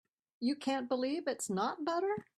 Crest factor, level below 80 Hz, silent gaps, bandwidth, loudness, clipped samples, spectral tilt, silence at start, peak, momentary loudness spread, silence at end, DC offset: 16 dB; -80 dBFS; none; 13 kHz; -36 LUFS; under 0.1%; -4 dB/octave; 0.4 s; -20 dBFS; 2 LU; 0.15 s; under 0.1%